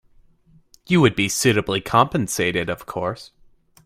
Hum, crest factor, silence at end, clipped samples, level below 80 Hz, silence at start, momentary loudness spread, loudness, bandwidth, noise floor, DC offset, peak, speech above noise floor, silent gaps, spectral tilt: none; 22 dB; 0.6 s; under 0.1%; -50 dBFS; 0.9 s; 10 LU; -20 LUFS; 16 kHz; -55 dBFS; under 0.1%; 0 dBFS; 35 dB; none; -4.5 dB/octave